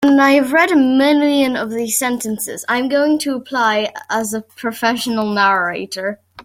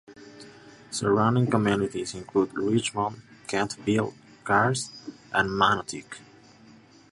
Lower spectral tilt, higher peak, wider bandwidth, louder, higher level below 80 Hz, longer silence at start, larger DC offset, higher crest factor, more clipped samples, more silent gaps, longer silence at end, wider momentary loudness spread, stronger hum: second, -3 dB/octave vs -5 dB/octave; first, -2 dBFS vs -6 dBFS; first, 16.5 kHz vs 11.5 kHz; first, -16 LUFS vs -26 LUFS; about the same, -60 dBFS vs -58 dBFS; about the same, 0 s vs 0.1 s; neither; second, 14 dB vs 22 dB; neither; neither; second, 0.05 s vs 0.95 s; second, 10 LU vs 20 LU; neither